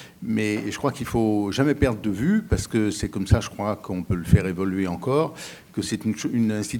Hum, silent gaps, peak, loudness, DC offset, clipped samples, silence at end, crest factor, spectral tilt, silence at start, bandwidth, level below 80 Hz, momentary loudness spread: none; none; -2 dBFS; -24 LUFS; under 0.1%; under 0.1%; 0 s; 20 dB; -6.5 dB/octave; 0 s; 18.5 kHz; -38 dBFS; 7 LU